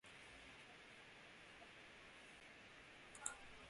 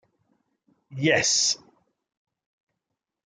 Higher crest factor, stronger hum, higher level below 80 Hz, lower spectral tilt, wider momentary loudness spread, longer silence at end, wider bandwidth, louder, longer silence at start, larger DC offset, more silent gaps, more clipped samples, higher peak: first, 34 dB vs 22 dB; neither; second, -78 dBFS vs -68 dBFS; about the same, -1 dB/octave vs -2 dB/octave; second, 10 LU vs 13 LU; second, 0 s vs 1.7 s; about the same, 11.5 kHz vs 11 kHz; second, -57 LUFS vs -22 LUFS; second, 0.05 s vs 0.9 s; neither; neither; neither; second, -26 dBFS vs -6 dBFS